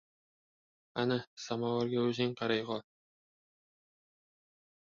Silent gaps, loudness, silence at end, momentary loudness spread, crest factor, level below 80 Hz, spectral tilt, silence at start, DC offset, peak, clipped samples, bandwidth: 1.27-1.37 s; -35 LUFS; 2.15 s; 9 LU; 20 dB; -76 dBFS; -4.5 dB/octave; 0.95 s; under 0.1%; -18 dBFS; under 0.1%; 7.2 kHz